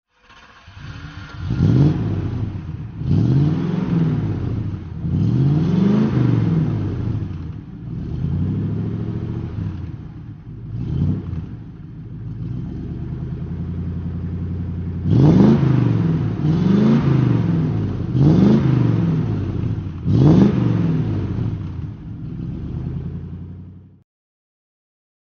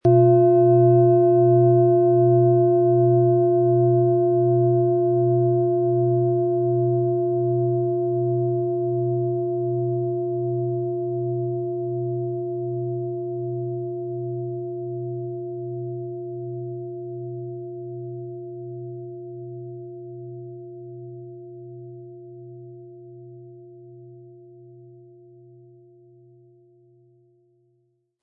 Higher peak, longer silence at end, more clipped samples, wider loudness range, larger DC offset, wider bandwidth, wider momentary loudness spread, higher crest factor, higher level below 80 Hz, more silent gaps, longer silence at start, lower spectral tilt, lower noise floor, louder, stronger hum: first, 0 dBFS vs -6 dBFS; second, 1.5 s vs 3.9 s; neither; second, 11 LU vs 22 LU; neither; first, 6.6 kHz vs 1.6 kHz; second, 18 LU vs 22 LU; about the same, 18 dB vs 16 dB; first, -36 dBFS vs -70 dBFS; neither; first, 0.65 s vs 0.05 s; second, -9.5 dB/octave vs -14.5 dB/octave; second, -48 dBFS vs -69 dBFS; about the same, -19 LUFS vs -21 LUFS; neither